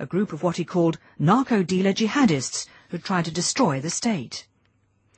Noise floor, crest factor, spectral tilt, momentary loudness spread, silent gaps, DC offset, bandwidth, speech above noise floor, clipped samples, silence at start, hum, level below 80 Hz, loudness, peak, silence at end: -65 dBFS; 16 dB; -5 dB/octave; 10 LU; none; under 0.1%; 8.8 kHz; 42 dB; under 0.1%; 0 s; none; -62 dBFS; -23 LUFS; -8 dBFS; 0.75 s